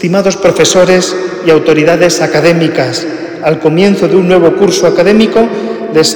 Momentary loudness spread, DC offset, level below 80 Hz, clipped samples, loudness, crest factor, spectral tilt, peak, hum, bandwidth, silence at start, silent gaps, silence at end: 7 LU; under 0.1%; -44 dBFS; 2%; -8 LUFS; 8 dB; -4.5 dB/octave; 0 dBFS; none; 19 kHz; 0 s; none; 0 s